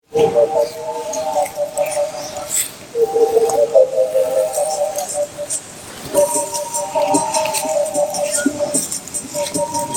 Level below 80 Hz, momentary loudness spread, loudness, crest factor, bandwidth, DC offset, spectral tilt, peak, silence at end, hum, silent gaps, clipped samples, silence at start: -56 dBFS; 9 LU; -18 LUFS; 18 dB; 17.5 kHz; under 0.1%; -2.5 dB/octave; 0 dBFS; 0 s; none; none; under 0.1%; 0.1 s